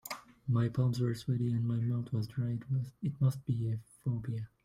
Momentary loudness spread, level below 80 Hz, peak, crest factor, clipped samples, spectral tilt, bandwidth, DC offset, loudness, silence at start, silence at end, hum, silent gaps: 7 LU; -64 dBFS; -18 dBFS; 14 dB; under 0.1%; -8 dB/octave; 16 kHz; under 0.1%; -34 LUFS; 0.05 s; 0.2 s; none; none